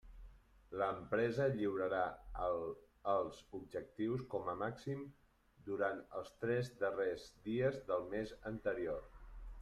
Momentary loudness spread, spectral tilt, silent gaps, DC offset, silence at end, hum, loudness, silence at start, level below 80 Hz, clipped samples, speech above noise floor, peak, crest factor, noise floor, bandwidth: 11 LU; -7 dB/octave; none; under 0.1%; 0 s; none; -41 LUFS; 0.05 s; -60 dBFS; under 0.1%; 20 dB; -24 dBFS; 18 dB; -60 dBFS; 13 kHz